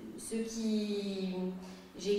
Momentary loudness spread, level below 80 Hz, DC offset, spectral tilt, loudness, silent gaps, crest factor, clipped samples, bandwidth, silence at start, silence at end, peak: 9 LU; -66 dBFS; under 0.1%; -5.5 dB/octave; -37 LUFS; none; 14 dB; under 0.1%; 15.5 kHz; 0 s; 0 s; -22 dBFS